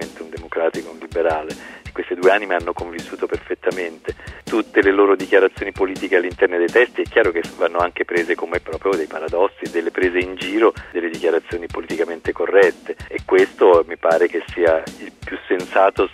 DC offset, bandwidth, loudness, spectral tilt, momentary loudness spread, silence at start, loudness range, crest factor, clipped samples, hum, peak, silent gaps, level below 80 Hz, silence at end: under 0.1%; 13.5 kHz; -19 LUFS; -5 dB/octave; 14 LU; 0 s; 5 LU; 18 dB; under 0.1%; none; -2 dBFS; none; -46 dBFS; 0 s